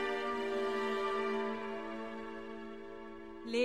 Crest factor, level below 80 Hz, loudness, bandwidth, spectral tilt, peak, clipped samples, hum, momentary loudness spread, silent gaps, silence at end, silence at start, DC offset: 16 dB; -68 dBFS; -38 LUFS; 12.5 kHz; -4.5 dB/octave; -20 dBFS; under 0.1%; none; 13 LU; none; 0 s; 0 s; 0.2%